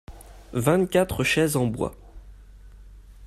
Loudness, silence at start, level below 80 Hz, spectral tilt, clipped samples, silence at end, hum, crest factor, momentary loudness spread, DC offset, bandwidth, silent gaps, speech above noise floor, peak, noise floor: -23 LUFS; 0.1 s; -46 dBFS; -5 dB/octave; under 0.1%; 0 s; none; 18 dB; 10 LU; under 0.1%; 15 kHz; none; 23 dB; -8 dBFS; -46 dBFS